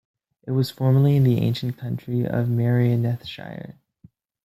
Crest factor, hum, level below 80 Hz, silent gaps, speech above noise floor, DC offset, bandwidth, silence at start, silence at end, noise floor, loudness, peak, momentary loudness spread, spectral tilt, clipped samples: 14 dB; none; -58 dBFS; none; 34 dB; under 0.1%; 14.5 kHz; 0.45 s; 0.75 s; -55 dBFS; -22 LUFS; -8 dBFS; 18 LU; -8.5 dB/octave; under 0.1%